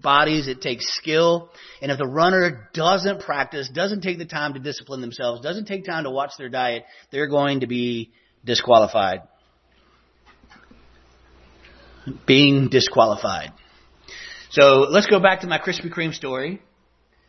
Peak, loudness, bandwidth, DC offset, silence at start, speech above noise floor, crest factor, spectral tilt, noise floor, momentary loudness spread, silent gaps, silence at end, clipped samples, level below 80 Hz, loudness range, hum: 0 dBFS; -20 LUFS; 6.4 kHz; under 0.1%; 0.05 s; 41 dB; 20 dB; -5 dB/octave; -61 dBFS; 17 LU; none; 0.7 s; under 0.1%; -56 dBFS; 8 LU; none